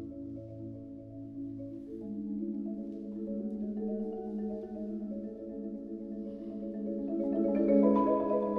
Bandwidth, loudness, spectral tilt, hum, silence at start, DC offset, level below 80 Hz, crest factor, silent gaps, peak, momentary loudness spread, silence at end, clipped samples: 3.7 kHz; -35 LUFS; -11.5 dB/octave; none; 0 s; under 0.1%; -62 dBFS; 20 dB; none; -14 dBFS; 17 LU; 0 s; under 0.1%